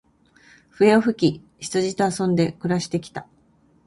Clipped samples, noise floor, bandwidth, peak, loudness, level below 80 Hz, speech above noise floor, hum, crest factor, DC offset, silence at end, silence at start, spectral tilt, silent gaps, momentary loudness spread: under 0.1%; -59 dBFS; 11.5 kHz; -4 dBFS; -21 LUFS; -58 dBFS; 38 dB; none; 20 dB; under 0.1%; 0.65 s; 0.8 s; -6 dB/octave; none; 14 LU